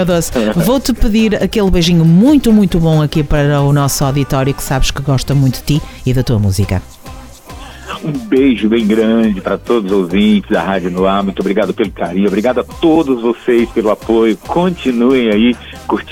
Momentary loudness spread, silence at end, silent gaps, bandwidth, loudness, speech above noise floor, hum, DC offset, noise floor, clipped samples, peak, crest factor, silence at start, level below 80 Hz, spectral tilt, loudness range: 8 LU; 0 s; none; 19.5 kHz; -13 LUFS; 20 dB; none; under 0.1%; -31 dBFS; under 0.1%; -2 dBFS; 10 dB; 0 s; -26 dBFS; -6.5 dB/octave; 5 LU